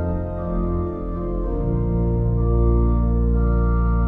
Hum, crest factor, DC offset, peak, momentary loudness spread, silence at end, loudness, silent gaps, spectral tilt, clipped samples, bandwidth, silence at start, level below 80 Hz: none; 12 dB; under 0.1%; -8 dBFS; 7 LU; 0 s; -22 LUFS; none; -13 dB/octave; under 0.1%; 2.2 kHz; 0 s; -22 dBFS